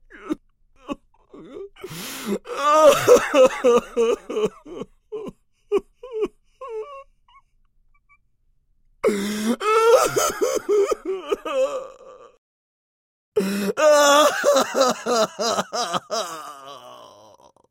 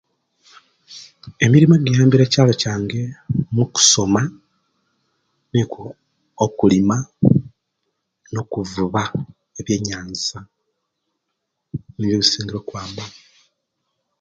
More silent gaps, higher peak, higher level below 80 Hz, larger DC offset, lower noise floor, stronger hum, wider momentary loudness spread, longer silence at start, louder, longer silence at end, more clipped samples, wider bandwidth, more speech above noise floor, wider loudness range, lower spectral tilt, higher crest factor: first, 12.38-13.32 s vs none; about the same, -2 dBFS vs 0 dBFS; second, -56 dBFS vs -50 dBFS; neither; second, -63 dBFS vs -77 dBFS; neither; about the same, 22 LU vs 21 LU; second, 0.15 s vs 0.9 s; about the same, -20 LUFS vs -18 LUFS; second, 0.75 s vs 1.1 s; neither; first, 16.5 kHz vs 9.4 kHz; second, 44 dB vs 59 dB; first, 13 LU vs 10 LU; second, -3 dB/octave vs -4.5 dB/octave; about the same, 20 dB vs 20 dB